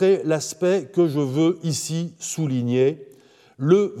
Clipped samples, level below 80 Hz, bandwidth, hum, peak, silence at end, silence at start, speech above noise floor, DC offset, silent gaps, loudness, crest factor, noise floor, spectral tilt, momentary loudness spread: under 0.1%; -76 dBFS; 15 kHz; none; -4 dBFS; 0 s; 0 s; 31 dB; under 0.1%; none; -22 LUFS; 16 dB; -52 dBFS; -6 dB/octave; 9 LU